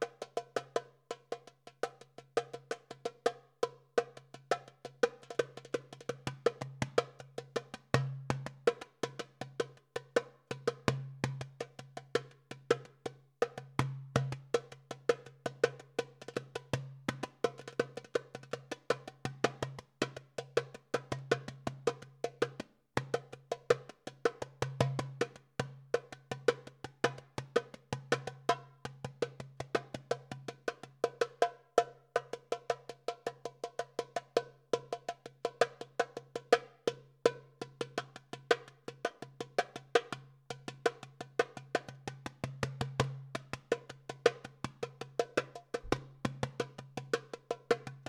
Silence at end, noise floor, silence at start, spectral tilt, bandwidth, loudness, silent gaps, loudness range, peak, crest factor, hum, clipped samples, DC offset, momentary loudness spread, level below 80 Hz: 0.05 s; -56 dBFS; 0 s; -5 dB/octave; 13.5 kHz; -38 LUFS; none; 3 LU; -8 dBFS; 30 dB; none; under 0.1%; under 0.1%; 12 LU; -68 dBFS